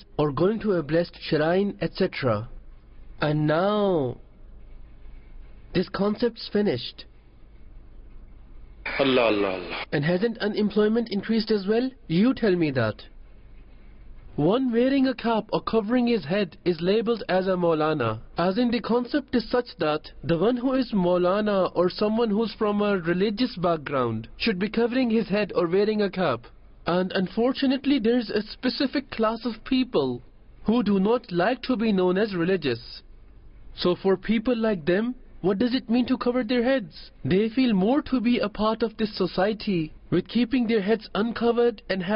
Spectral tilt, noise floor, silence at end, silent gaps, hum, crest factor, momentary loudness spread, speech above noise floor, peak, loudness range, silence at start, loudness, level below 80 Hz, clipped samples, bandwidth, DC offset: -11 dB/octave; -48 dBFS; 0 s; none; none; 14 dB; 6 LU; 25 dB; -10 dBFS; 4 LU; 0 s; -24 LUFS; -50 dBFS; under 0.1%; 5.6 kHz; under 0.1%